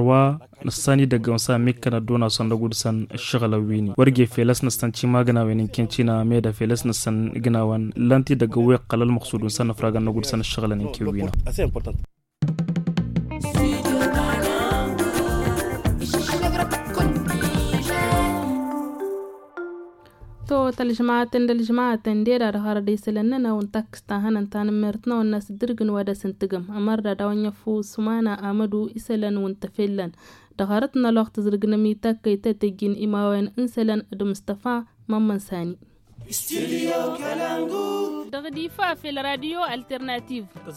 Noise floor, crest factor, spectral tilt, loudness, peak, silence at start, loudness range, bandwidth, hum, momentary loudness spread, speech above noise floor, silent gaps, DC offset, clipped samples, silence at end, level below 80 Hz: -45 dBFS; 20 dB; -6 dB/octave; -23 LUFS; -4 dBFS; 0 s; 5 LU; 17 kHz; none; 10 LU; 23 dB; none; under 0.1%; under 0.1%; 0 s; -38 dBFS